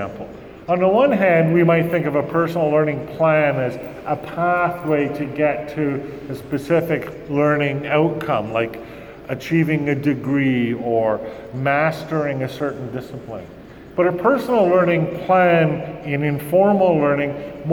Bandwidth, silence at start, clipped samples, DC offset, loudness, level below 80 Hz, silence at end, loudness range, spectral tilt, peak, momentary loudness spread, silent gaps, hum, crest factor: 19 kHz; 0 s; under 0.1%; under 0.1%; -19 LUFS; -52 dBFS; 0 s; 5 LU; -8 dB/octave; -4 dBFS; 15 LU; none; none; 16 dB